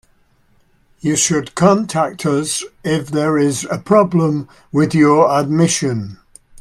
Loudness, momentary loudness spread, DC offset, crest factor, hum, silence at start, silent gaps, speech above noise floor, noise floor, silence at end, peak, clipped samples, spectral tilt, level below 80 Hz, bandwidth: -16 LUFS; 9 LU; under 0.1%; 16 dB; none; 1.05 s; none; 40 dB; -55 dBFS; 0.45 s; 0 dBFS; under 0.1%; -5 dB/octave; -52 dBFS; 14.5 kHz